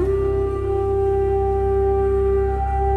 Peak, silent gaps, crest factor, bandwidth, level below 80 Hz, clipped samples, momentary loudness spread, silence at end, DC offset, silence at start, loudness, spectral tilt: -10 dBFS; none; 10 dB; 3.7 kHz; -26 dBFS; under 0.1%; 3 LU; 0 s; under 0.1%; 0 s; -20 LUFS; -10 dB/octave